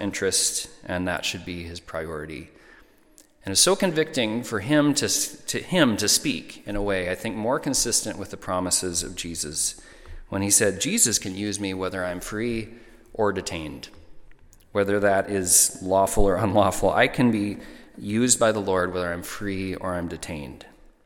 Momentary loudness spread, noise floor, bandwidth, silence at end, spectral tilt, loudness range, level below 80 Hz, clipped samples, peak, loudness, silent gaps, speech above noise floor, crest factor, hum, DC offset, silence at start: 15 LU; -55 dBFS; 17.5 kHz; 0.4 s; -3 dB/octave; 6 LU; -42 dBFS; under 0.1%; -4 dBFS; -23 LUFS; none; 31 dB; 20 dB; none; under 0.1%; 0 s